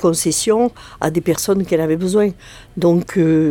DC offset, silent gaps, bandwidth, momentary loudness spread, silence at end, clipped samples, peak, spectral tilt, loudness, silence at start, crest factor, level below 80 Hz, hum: under 0.1%; none; 18 kHz; 5 LU; 0 s; under 0.1%; 0 dBFS; -5.5 dB/octave; -17 LUFS; 0 s; 16 dB; -46 dBFS; none